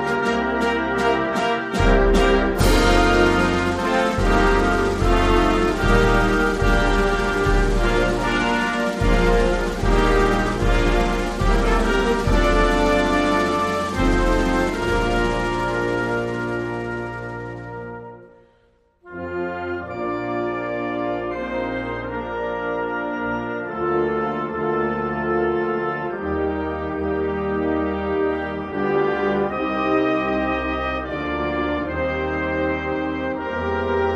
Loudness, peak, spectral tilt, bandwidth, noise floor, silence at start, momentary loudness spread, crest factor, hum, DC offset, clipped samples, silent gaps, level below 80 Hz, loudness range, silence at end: -21 LUFS; -4 dBFS; -6 dB/octave; 15 kHz; -59 dBFS; 0 s; 9 LU; 16 dB; none; under 0.1%; under 0.1%; none; -26 dBFS; 8 LU; 0 s